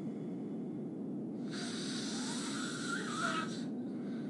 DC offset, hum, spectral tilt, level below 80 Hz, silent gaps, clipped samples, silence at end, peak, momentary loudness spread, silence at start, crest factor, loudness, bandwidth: under 0.1%; none; -4 dB/octave; -82 dBFS; none; under 0.1%; 0 s; -22 dBFS; 6 LU; 0 s; 16 dB; -39 LUFS; 11.5 kHz